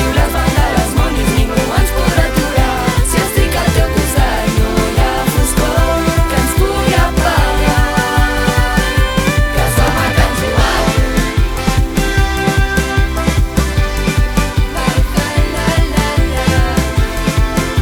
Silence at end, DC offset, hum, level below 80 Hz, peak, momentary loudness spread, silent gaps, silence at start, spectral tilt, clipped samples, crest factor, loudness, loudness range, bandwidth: 0 s; under 0.1%; none; -16 dBFS; 0 dBFS; 2 LU; none; 0 s; -5 dB/octave; under 0.1%; 12 dB; -14 LUFS; 2 LU; 19.5 kHz